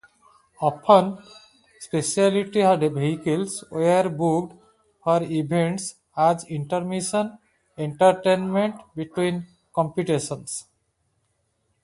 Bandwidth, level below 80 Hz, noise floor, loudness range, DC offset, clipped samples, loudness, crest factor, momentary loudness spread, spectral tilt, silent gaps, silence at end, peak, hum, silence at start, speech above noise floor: 11.5 kHz; -64 dBFS; -71 dBFS; 3 LU; under 0.1%; under 0.1%; -23 LUFS; 22 dB; 13 LU; -5.5 dB/octave; none; 1.2 s; -2 dBFS; none; 0.6 s; 49 dB